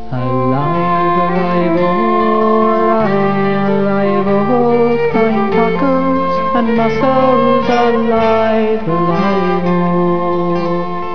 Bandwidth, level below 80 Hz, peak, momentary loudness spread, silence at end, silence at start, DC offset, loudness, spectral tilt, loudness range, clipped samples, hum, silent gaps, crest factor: 5.4 kHz; -42 dBFS; 0 dBFS; 3 LU; 0 s; 0 s; 8%; -13 LUFS; -8.5 dB/octave; 1 LU; under 0.1%; none; none; 12 dB